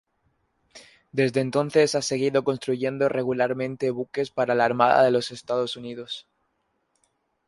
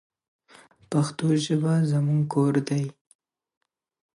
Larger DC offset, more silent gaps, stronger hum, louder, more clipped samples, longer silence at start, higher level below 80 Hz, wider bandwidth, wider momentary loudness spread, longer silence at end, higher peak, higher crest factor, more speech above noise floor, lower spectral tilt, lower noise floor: neither; neither; neither; about the same, -24 LUFS vs -24 LUFS; neither; second, 0.75 s vs 0.9 s; about the same, -68 dBFS vs -70 dBFS; about the same, 11.5 kHz vs 11.5 kHz; first, 12 LU vs 6 LU; about the same, 1.25 s vs 1.25 s; first, -4 dBFS vs -10 dBFS; about the same, 20 dB vs 16 dB; first, 50 dB vs 32 dB; second, -5 dB/octave vs -7 dB/octave; first, -73 dBFS vs -55 dBFS